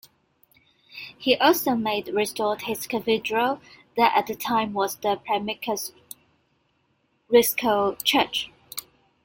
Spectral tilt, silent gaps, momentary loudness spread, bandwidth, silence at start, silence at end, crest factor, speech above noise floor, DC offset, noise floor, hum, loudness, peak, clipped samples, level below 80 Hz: -3 dB/octave; none; 17 LU; 17 kHz; 0.95 s; 0.45 s; 22 dB; 46 dB; under 0.1%; -69 dBFS; none; -24 LUFS; -4 dBFS; under 0.1%; -64 dBFS